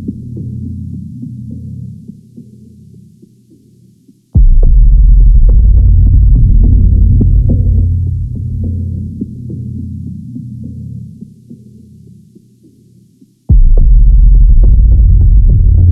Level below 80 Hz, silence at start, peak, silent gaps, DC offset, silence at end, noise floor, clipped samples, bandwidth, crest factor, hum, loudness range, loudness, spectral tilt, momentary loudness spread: -10 dBFS; 0 s; 0 dBFS; none; under 0.1%; 0 s; -46 dBFS; under 0.1%; 0.8 kHz; 8 dB; none; 19 LU; -11 LUFS; -13 dB/octave; 17 LU